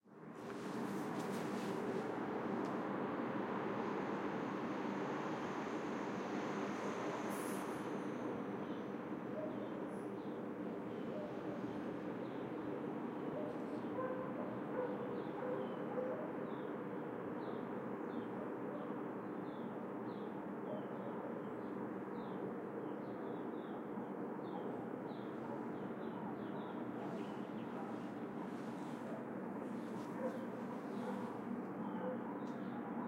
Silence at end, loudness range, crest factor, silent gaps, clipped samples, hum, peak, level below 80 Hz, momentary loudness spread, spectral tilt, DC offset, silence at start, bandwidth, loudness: 0 s; 4 LU; 14 dB; none; under 0.1%; none; -28 dBFS; -84 dBFS; 4 LU; -7 dB/octave; under 0.1%; 0.05 s; 16 kHz; -44 LUFS